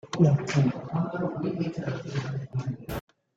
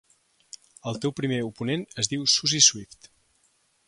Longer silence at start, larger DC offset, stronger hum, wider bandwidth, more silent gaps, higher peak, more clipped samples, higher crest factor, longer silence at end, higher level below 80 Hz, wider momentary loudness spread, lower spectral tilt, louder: second, 0.05 s vs 0.85 s; neither; neither; first, 15.5 kHz vs 11.5 kHz; neither; second, -8 dBFS vs -4 dBFS; neither; about the same, 20 dB vs 24 dB; second, 0.35 s vs 1.05 s; first, -54 dBFS vs -64 dBFS; second, 12 LU vs 16 LU; first, -7.5 dB/octave vs -2 dB/octave; second, -29 LUFS vs -23 LUFS